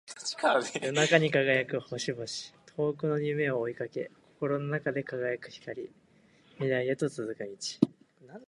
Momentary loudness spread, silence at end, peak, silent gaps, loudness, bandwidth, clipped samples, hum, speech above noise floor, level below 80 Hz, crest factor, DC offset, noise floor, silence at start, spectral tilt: 14 LU; 0.05 s; -6 dBFS; none; -30 LUFS; 11.5 kHz; under 0.1%; none; 32 dB; -74 dBFS; 24 dB; under 0.1%; -62 dBFS; 0.05 s; -4.5 dB/octave